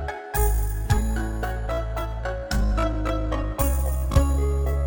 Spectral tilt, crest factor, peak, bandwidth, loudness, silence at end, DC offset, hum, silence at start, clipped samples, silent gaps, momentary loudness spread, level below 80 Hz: -6 dB/octave; 18 dB; -6 dBFS; 19.5 kHz; -25 LUFS; 0 s; under 0.1%; none; 0 s; under 0.1%; none; 6 LU; -24 dBFS